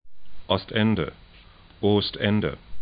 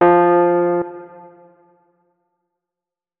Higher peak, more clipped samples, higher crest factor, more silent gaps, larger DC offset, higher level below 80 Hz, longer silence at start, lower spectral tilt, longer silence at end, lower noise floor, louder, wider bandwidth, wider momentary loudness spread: second, -6 dBFS vs -2 dBFS; neither; about the same, 20 dB vs 18 dB; neither; neither; first, -48 dBFS vs -60 dBFS; about the same, 0.05 s vs 0 s; about the same, -11 dB/octave vs -11.5 dB/octave; second, 0 s vs 2.15 s; second, -50 dBFS vs -88 dBFS; second, -25 LUFS vs -15 LUFS; first, 5.2 kHz vs 3.5 kHz; second, 6 LU vs 18 LU